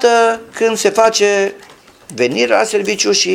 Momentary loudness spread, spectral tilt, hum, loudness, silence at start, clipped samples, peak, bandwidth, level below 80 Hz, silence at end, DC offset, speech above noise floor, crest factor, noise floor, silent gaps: 6 LU; -2 dB/octave; none; -14 LUFS; 0 s; under 0.1%; 0 dBFS; 16 kHz; -58 dBFS; 0 s; under 0.1%; 27 dB; 14 dB; -40 dBFS; none